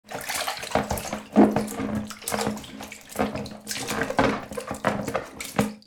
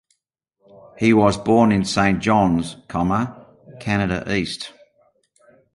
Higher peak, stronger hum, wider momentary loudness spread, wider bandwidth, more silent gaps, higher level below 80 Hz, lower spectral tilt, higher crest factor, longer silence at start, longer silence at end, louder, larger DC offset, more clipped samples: about the same, -4 dBFS vs -2 dBFS; neither; about the same, 13 LU vs 13 LU; first, over 20 kHz vs 11.5 kHz; neither; second, -50 dBFS vs -44 dBFS; second, -4.5 dB/octave vs -6 dB/octave; about the same, 22 dB vs 18 dB; second, 0.05 s vs 0.95 s; second, 0.05 s vs 1.05 s; second, -27 LUFS vs -19 LUFS; neither; neither